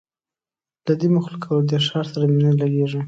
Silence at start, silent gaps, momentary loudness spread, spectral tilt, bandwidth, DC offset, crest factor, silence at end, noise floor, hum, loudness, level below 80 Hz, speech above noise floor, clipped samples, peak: 0.85 s; none; 6 LU; -8 dB/octave; 7.8 kHz; under 0.1%; 14 dB; 0 s; under -90 dBFS; none; -20 LUFS; -64 dBFS; over 71 dB; under 0.1%; -6 dBFS